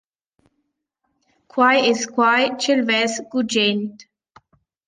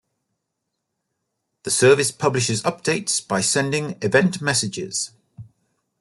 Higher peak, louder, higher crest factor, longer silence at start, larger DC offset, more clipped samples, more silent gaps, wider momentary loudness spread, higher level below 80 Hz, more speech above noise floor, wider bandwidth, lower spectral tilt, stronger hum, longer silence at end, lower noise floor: about the same, -4 dBFS vs -4 dBFS; about the same, -18 LUFS vs -20 LUFS; about the same, 18 dB vs 20 dB; about the same, 1.55 s vs 1.65 s; neither; neither; neither; about the same, 9 LU vs 10 LU; second, -70 dBFS vs -62 dBFS; about the same, 56 dB vs 58 dB; second, 9.8 kHz vs 12.5 kHz; about the same, -3 dB/octave vs -3.5 dB/octave; neither; first, 0.85 s vs 0.6 s; second, -74 dBFS vs -79 dBFS